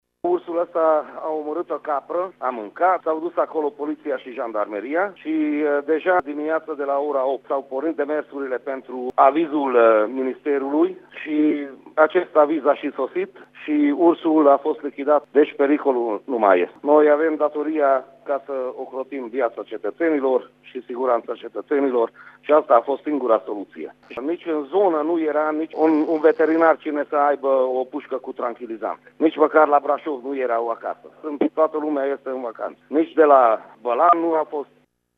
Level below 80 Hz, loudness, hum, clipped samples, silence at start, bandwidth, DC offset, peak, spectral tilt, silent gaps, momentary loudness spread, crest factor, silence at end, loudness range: -76 dBFS; -21 LUFS; 50 Hz at -70 dBFS; under 0.1%; 0.25 s; 4.9 kHz; under 0.1%; 0 dBFS; -7.5 dB/octave; none; 13 LU; 20 dB; 0.55 s; 5 LU